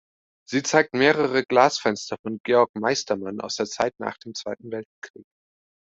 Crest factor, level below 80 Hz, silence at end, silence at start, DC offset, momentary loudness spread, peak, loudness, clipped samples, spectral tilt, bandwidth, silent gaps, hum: 22 dB; -66 dBFS; 0.8 s; 0.5 s; under 0.1%; 15 LU; -2 dBFS; -23 LUFS; under 0.1%; -3.5 dB/octave; 8 kHz; 2.19-2.24 s, 2.40-2.44 s, 2.69-2.74 s, 4.85-5.02 s; none